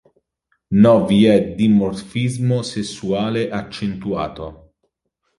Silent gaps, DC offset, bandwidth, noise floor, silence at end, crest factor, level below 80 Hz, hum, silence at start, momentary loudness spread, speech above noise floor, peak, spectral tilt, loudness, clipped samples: none; under 0.1%; 11.5 kHz; -72 dBFS; 0.85 s; 16 dB; -48 dBFS; none; 0.7 s; 13 LU; 55 dB; -2 dBFS; -7 dB/octave; -18 LUFS; under 0.1%